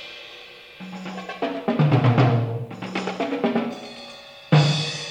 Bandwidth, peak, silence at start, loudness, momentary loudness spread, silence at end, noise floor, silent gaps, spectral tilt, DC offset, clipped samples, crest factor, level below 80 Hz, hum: 9.8 kHz; -4 dBFS; 0 s; -22 LUFS; 21 LU; 0 s; -43 dBFS; none; -6.5 dB/octave; under 0.1%; under 0.1%; 18 dB; -66 dBFS; none